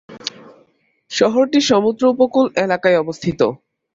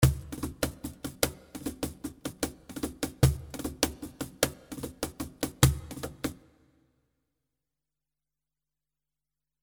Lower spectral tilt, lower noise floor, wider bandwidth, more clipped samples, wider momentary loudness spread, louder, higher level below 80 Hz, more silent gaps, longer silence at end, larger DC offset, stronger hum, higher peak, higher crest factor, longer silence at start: about the same, -4.5 dB/octave vs -4.5 dB/octave; second, -58 dBFS vs -90 dBFS; second, 7.8 kHz vs over 20 kHz; neither; about the same, 12 LU vs 14 LU; first, -16 LUFS vs -32 LUFS; second, -56 dBFS vs -42 dBFS; neither; second, 0.4 s vs 3.25 s; neither; second, none vs 50 Hz at -60 dBFS; about the same, -2 dBFS vs 0 dBFS; second, 16 dB vs 32 dB; about the same, 0.1 s vs 0 s